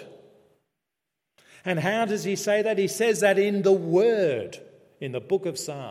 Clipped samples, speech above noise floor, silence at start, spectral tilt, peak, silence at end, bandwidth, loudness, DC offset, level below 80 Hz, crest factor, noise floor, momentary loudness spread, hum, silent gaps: under 0.1%; 61 dB; 0 s; -5 dB/octave; -8 dBFS; 0 s; 15.5 kHz; -24 LUFS; under 0.1%; -76 dBFS; 18 dB; -84 dBFS; 14 LU; none; none